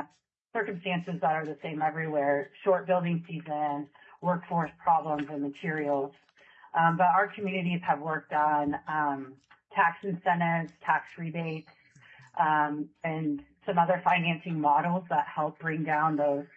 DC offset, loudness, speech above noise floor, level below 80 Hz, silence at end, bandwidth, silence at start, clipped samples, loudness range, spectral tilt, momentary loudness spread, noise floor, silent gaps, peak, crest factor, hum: under 0.1%; -29 LUFS; 35 dB; -76 dBFS; 0.1 s; 6.6 kHz; 0 s; under 0.1%; 3 LU; -8.5 dB/octave; 9 LU; -64 dBFS; none; -12 dBFS; 18 dB; none